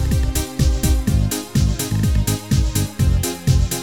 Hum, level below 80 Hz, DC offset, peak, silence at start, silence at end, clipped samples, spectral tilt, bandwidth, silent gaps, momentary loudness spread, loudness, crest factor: none; -22 dBFS; 0.4%; -4 dBFS; 0 s; 0 s; under 0.1%; -5 dB/octave; 17.5 kHz; none; 2 LU; -19 LUFS; 14 dB